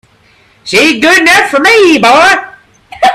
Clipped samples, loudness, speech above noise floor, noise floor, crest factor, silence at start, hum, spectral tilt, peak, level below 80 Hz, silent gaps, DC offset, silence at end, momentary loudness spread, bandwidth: 0.6%; -5 LUFS; 40 dB; -45 dBFS; 8 dB; 0.65 s; none; -2.5 dB/octave; 0 dBFS; -44 dBFS; none; under 0.1%; 0 s; 7 LU; 16.5 kHz